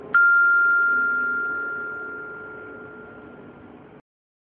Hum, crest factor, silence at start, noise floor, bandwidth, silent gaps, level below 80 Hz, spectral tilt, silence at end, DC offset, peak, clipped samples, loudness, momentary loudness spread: none; 14 dB; 0 s; -45 dBFS; 3.7 kHz; none; -66 dBFS; -8 dB/octave; 0.65 s; under 0.1%; -10 dBFS; under 0.1%; -19 LUFS; 24 LU